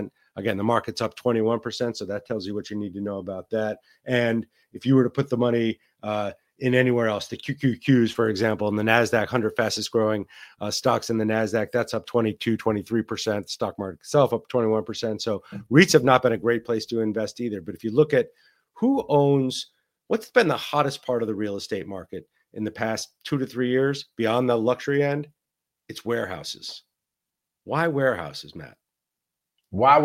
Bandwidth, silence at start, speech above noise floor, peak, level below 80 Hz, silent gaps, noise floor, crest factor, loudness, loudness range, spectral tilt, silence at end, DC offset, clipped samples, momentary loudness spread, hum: 16.5 kHz; 0 s; 62 dB; -2 dBFS; -64 dBFS; none; -85 dBFS; 22 dB; -24 LUFS; 6 LU; -5.5 dB/octave; 0 s; under 0.1%; under 0.1%; 13 LU; none